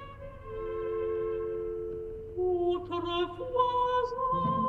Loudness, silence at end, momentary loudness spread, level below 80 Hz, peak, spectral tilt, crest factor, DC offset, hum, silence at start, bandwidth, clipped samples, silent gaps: -32 LUFS; 0 s; 11 LU; -50 dBFS; -14 dBFS; -7.5 dB/octave; 16 dB; under 0.1%; none; 0 s; 6.4 kHz; under 0.1%; none